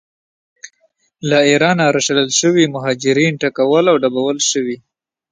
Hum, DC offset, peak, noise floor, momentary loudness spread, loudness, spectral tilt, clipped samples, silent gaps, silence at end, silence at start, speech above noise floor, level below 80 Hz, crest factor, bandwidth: none; under 0.1%; 0 dBFS; -61 dBFS; 6 LU; -14 LUFS; -3.5 dB/octave; under 0.1%; none; 0.55 s; 0.65 s; 47 dB; -60 dBFS; 16 dB; 10 kHz